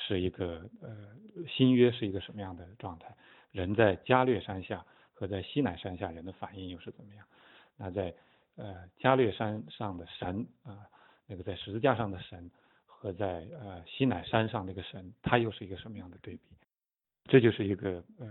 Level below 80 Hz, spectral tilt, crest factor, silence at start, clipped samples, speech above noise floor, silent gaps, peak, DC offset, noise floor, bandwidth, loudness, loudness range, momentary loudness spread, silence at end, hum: -62 dBFS; -10.5 dB/octave; 26 dB; 0 s; under 0.1%; over 58 dB; none; -8 dBFS; under 0.1%; under -90 dBFS; 4.2 kHz; -32 LUFS; 8 LU; 21 LU; 0 s; none